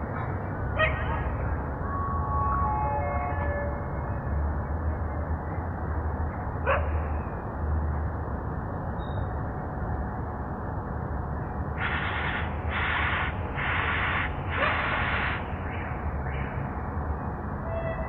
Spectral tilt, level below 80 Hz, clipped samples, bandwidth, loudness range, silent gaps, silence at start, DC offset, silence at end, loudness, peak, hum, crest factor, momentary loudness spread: -9 dB/octave; -36 dBFS; under 0.1%; 4.2 kHz; 5 LU; none; 0 s; under 0.1%; 0 s; -30 LUFS; -12 dBFS; none; 18 dB; 7 LU